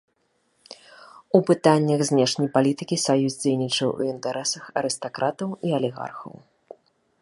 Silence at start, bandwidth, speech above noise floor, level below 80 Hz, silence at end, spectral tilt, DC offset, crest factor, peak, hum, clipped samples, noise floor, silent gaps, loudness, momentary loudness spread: 1 s; 11.5 kHz; 47 dB; -70 dBFS; 0.9 s; -5 dB/octave; under 0.1%; 22 dB; -2 dBFS; none; under 0.1%; -69 dBFS; none; -23 LUFS; 14 LU